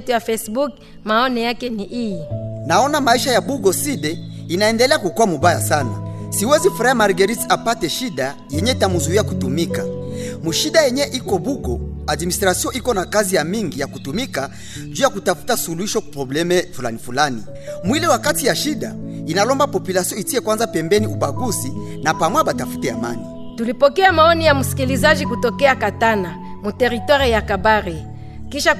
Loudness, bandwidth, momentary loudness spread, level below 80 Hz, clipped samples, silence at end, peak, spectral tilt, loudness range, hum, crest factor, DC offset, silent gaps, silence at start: -18 LUFS; 14 kHz; 11 LU; -40 dBFS; under 0.1%; 0 s; -2 dBFS; -4 dB/octave; 4 LU; none; 16 dB; under 0.1%; none; 0 s